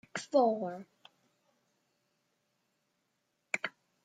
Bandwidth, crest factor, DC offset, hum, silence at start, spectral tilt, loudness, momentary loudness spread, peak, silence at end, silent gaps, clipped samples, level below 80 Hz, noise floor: 9.4 kHz; 24 dB; under 0.1%; none; 0.15 s; -4.5 dB/octave; -33 LUFS; 14 LU; -14 dBFS; 0.35 s; none; under 0.1%; -88 dBFS; -81 dBFS